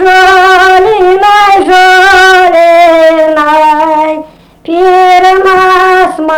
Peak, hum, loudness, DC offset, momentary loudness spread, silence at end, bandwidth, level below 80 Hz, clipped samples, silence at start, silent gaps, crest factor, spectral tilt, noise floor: 0 dBFS; none; -4 LUFS; under 0.1%; 5 LU; 0 s; 19.5 kHz; -36 dBFS; 4%; 0 s; none; 4 dB; -2.5 dB/octave; -26 dBFS